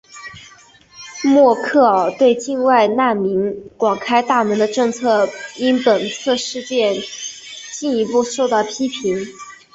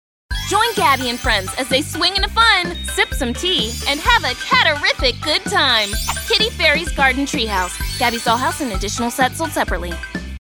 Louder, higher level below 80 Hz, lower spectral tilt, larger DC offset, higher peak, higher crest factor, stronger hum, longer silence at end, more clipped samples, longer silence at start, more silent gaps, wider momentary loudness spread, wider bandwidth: about the same, -17 LUFS vs -16 LUFS; second, -60 dBFS vs -30 dBFS; first, -4 dB/octave vs -2.5 dB/octave; neither; about the same, -2 dBFS vs 0 dBFS; about the same, 16 dB vs 18 dB; neither; about the same, 0.2 s vs 0.15 s; neither; second, 0.15 s vs 0.3 s; neither; first, 15 LU vs 8 LU; second, 8.2 kHz vs over 20 kHz